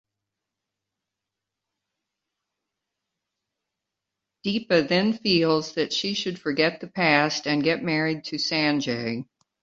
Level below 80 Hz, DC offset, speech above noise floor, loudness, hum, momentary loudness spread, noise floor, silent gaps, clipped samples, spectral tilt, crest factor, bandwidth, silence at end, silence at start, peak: -66 dBFS; under 0.1%; 62 dB; -24 LUFS; none; 8 LU; -86 dBFS; none; under 0.1%; -4.5 dB/octave; 22 dB; 7.8 kHz; 0.4 s; 4.45 s; -4 dBFS